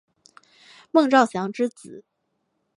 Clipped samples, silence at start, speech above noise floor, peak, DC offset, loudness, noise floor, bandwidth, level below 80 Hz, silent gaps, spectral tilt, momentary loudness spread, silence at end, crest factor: under 0.1%; 0.95 s; 53 dB; -2 dBFS; under 0.1%; -21 LUFS; -74 dBFS; 11 kHz; -76 dBFS; none; -5 dB/octave; 10 LU; 0.75 s; 22 dB